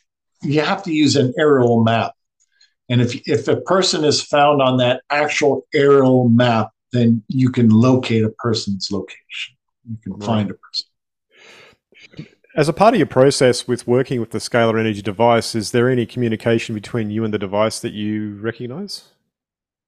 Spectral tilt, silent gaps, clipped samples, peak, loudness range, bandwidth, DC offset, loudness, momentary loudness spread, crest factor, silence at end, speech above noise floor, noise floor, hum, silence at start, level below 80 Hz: -5.5 dB/octave; none; under 0.1%; 0 dBFS; 9 LU; 13 kHz; under 0.1%; -17 LUFS; 13 LU; 18 dB; 0.9 s; 72 dB; -89 dBFS; none; 0.4 s; -56 dBFS